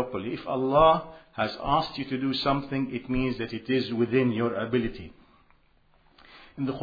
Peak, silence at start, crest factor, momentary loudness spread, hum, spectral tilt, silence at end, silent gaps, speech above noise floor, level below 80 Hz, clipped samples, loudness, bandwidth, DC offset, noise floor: -8 dBFS; 0 s; 20 dB; 13 LU; none; -8 dB/octave; 0 s; none; 36 dB; -48 dBFS; under 0.1%; -27 LUFS; 5 kHz; under 0.1%; -62 dBFS